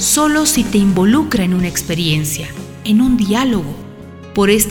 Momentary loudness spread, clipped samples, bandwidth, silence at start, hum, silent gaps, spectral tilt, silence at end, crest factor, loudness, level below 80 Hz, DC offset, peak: 15 LU; under 0.1%; 17.5 kHz; 0 s; none; none; -4 dB/octave; 0 s; 14 dB; -14 LUFS; -36 dBFS; under 0.1%; 0 dBFS